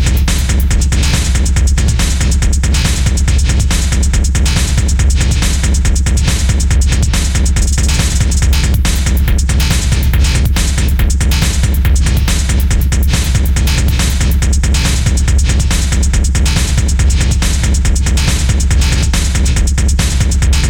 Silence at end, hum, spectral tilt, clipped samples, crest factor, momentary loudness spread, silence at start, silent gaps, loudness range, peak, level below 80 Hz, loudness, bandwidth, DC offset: 0 s; none; -4 dB/octave; under 0.1%; 8 dB; 1 LU; 0 s; none; 0 LU; -2 dBFS; -12 dBFS; -13 LUFS; 18.5 kHz; under 0.1%